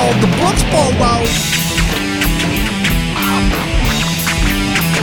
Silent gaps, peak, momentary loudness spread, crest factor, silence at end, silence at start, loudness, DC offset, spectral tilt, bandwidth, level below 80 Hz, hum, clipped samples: none; 0 dBFS; 3 LU; 12 dB; 0 s; 0 s; -14 LUFS; under 0.1%; -4 dB/octave; 19 kHz; -22 dBFS; none; under 0.1%